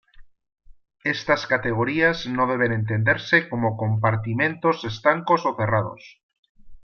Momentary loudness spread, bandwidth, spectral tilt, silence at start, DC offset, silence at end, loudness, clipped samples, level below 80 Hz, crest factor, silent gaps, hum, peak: 5 LU; 6.8 kHz; -7 dB/octave; 0.2 s; under 0.1%; 0.05 s; -22 LUFS; under 0.1%; -54 dBFS; 20 dB; 6.23-6.29 s, 6.39-6.43 s, 6.49-6.55 s; none; -4 dBFS